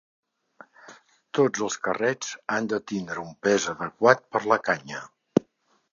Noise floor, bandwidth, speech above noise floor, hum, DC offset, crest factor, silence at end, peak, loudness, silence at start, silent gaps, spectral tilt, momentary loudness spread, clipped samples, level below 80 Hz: -66 dBFS; 7.6 kHz; 41 dB; none; under 0.1%; 26 dB; 0.5 s; -2 dBFS; -25 LUFS; 0.9 s; none; -4 dB/octave; 11 LU; under 0.1%; -68 dBFS